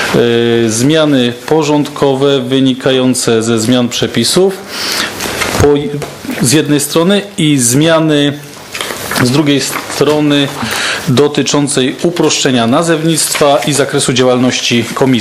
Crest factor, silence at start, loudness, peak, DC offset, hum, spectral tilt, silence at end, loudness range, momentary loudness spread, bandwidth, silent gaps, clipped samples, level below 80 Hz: 10 dB; 0 s; -11 LUFS; 0 dBFS; under 0.1%; none; -4 dB/octave; 0 s; 2 LU; 5 LU; 16 kHz; none; 0.3%; -42 dBFS